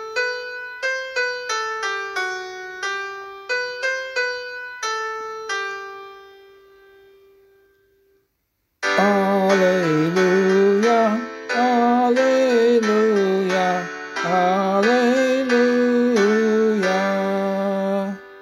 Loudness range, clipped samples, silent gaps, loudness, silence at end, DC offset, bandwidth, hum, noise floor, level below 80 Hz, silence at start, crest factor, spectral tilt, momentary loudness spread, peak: 12 LU; under 0.1%; none; -20 LUFS; 0 s; under 0.1%; 14 kHz; none; -72 dBFS; -68 dBFS; 0 s; 16 dB; -5 dB/octave; 12 LU; -4 dBFS